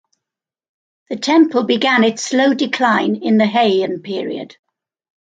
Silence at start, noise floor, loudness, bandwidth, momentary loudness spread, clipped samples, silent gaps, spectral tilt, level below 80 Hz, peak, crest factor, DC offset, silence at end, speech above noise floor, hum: 1.1 s; -86 dBFS; -15 LUFS; 9.2 kHz; 11 LU; under 0.1%; none; -4.5 dB/octave; -68 dBFS; -2 dBFS; 16 dB; under 0.1%; 0.75 s; 71 dB; none